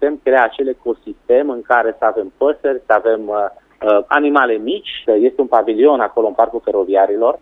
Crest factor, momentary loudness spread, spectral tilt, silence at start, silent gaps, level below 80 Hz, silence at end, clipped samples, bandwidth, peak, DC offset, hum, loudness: 14 dB; 8 LU; -6 dB/octave; 0 s; none; -54 dBFS; 0.05 s; under 0.1%; 4 kHz; 0 dBFS; under 0.1%; none; -15 LUFS